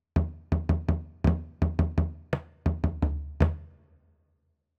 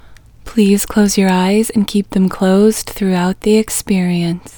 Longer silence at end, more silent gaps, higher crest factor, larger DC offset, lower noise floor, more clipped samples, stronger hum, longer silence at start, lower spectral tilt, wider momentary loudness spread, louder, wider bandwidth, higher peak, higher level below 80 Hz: first, 1.1 s vs 0.05 s; neither; first, 20 dB vs 14 dB; neither; first, -73 dBFS vs -35 dBFS; neither; neither; about the same, 0.15 s vs 0.05 s; first, -9.5 dB/octave vs -5.5 dB/octave; about the same, 4 LU vs 5 LU; second, -29 LUFS vs -14 LUFS; second, 5.8 kHz vs over 20 kHz; second, -10 dBFS vs 0 dBFS; first, -34 dBFS vs -40 dBFS